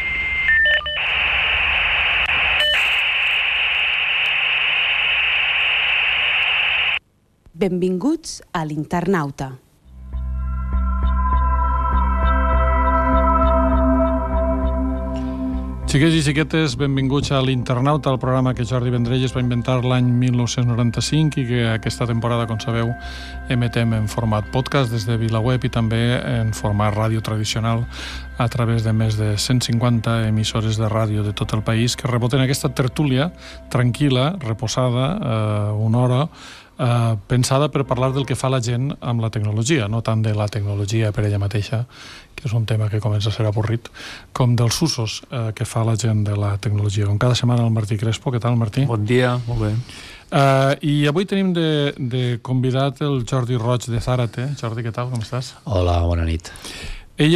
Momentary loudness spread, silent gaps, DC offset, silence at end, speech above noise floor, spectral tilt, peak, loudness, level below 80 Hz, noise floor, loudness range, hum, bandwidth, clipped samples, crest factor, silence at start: 10 LU; none; under 0.1%; 0 s; 35 dB; -5.5 dB/octave; -4 dBFS; -19 LUFS; -30 dBFS; -54 dBFS; 6 LU; none; 14 kHz; under 0.1%; 14 dB; 0 s